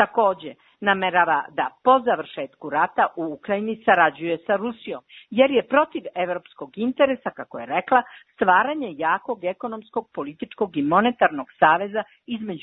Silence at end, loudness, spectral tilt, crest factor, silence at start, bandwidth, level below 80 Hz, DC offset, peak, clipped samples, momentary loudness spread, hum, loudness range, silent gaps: 0.05 s; -22 LUFS; -9 dB/octave; 20 dB; 0 s; 4.1 kHz; -66 dBFS; under 0.1%; -2 dBFS; under 0.1%; 14 LU; none; 2 LU; none